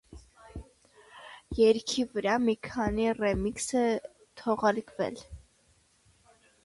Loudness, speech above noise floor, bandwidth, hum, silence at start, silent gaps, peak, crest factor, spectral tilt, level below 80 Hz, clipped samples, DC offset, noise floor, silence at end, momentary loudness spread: -29 LUFS; 38 dB; 11.5 kHz; none; 0.1 s; none; -12 dBFS; 20 dB; -4.5 dB/octave; -50 dBFS; under 0.1%; under 0.1%; -66 dBFS; 1.3 s; 23 LU